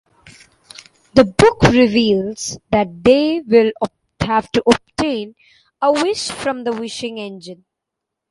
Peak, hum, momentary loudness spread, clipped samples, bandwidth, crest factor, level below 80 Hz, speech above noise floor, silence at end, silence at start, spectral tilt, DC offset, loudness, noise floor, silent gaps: 0 dBFS; none; 14 LU; under 0.1%; 11.5 kHz; 18 dB; -42 dBFS; 65 dB; 0.75 s; 1.15 s; -5 dB/octave; under 0.1%; -16 LUFS; -81 dBFS; none